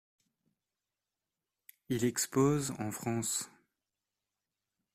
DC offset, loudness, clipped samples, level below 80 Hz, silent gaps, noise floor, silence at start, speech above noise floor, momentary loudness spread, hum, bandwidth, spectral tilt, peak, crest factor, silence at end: under 0.1%; -33 LUFS; under 0.1%; -68 dBFS; none; under -90 dBFS; 1.9 s; over 57 dB; 9 LU; none; 16 kHz; -4.5 dB/octave; -16 dBFS; 20 dB; 1.45 s